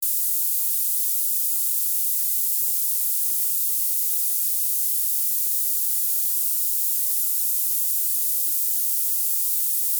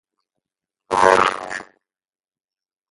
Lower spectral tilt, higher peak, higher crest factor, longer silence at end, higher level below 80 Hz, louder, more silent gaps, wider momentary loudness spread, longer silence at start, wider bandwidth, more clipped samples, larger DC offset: second, 11.5 dB/octave vs -3 dB/octave; second, -10 dBFS vs 0 dBFS; second, 12 dB vs 22 dB; second, 0 s vs 1.3 s; second, under -90 dBFS vs -56 dBFS; about the same, -19 LUFS vs -17 LUFS; neither; second, 0 LU vs 17 LU; second, 0 s vs 0.9 s; first, over 20 kHz vs 11.5 kHz; neither; neither